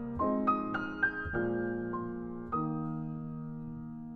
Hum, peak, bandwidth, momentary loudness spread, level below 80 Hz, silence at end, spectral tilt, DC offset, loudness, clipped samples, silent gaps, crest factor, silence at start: none; -18 dBFS; 6 kHz; 11 LU; -54 dBFS; 0 s; -9.5 dB/octave; under 0.1%; -35 LUFS; under 0.1%; none; 18 dB; 0 s